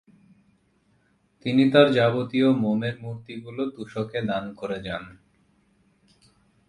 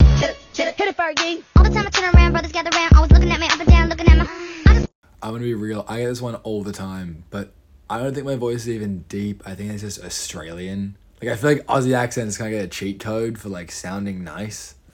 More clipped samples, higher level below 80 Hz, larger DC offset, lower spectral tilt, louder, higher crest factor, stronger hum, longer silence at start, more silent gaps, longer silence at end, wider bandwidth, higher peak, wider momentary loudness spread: neither; second, -60 dBFS vs -20 dBFS; neither; first, -7.5 dB/octave vs -5.5 dB/octave; second, -24 LUFS vs -19 LUFS; first, 24 dB vs 18 dB; neither; first, 1.45 s vs 0 s; second, none vs 4.95-5.02 s; first, 1.55 s vs 0.25 s; about the same, 11 kHz vs 10.5 kHz; about the same, -2 dBFS vs 0 dBFS; about the same, 18 LU vs 17 LU